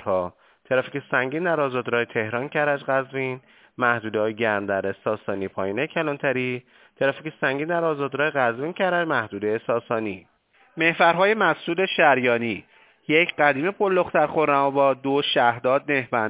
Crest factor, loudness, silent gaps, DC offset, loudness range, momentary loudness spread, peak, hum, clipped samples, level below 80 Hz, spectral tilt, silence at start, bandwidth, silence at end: 20 dB; -23 LUFS; none; under 0.1%; 5 LU; 9 LU; -4 dBFS; none; under 0.1%; -64 dBFS; -9 dB/octave; 0 s; 4 kHz; 0 s